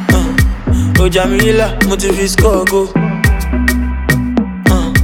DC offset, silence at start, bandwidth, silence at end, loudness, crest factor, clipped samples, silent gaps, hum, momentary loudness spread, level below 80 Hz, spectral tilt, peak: under 0.1%; 0 s; 18 kHz; 0 s; -12 LUFS; 12 dB; under 0.1%; none; none; 4 LU; -18 dBFS; -5.5 dB/octave; 0 dBFS